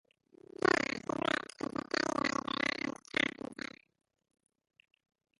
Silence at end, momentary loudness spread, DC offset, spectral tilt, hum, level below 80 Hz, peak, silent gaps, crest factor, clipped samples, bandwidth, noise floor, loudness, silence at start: 1.85 s; 13 LU; under 0.1%; -3.5 dB/octave; none; -70 dBFS; -14 dBFS; none; 22 dB; under 0.1%; 11.5 kHz; -59 dBFS; -34 LUFS; 0.6 s